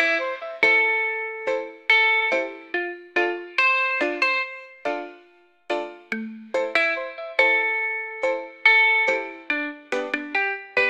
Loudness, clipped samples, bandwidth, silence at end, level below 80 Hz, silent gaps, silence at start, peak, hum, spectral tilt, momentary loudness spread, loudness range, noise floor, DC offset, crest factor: -21 LUFS; under 0.1%; 10.5 kHz; 0 s; -76 dBFS; none; 0 s; -4 dBFS; none; -2.5 dB/octave; 13 LU; 5 LU; -56 dBFS; under 0.1%; 20 dB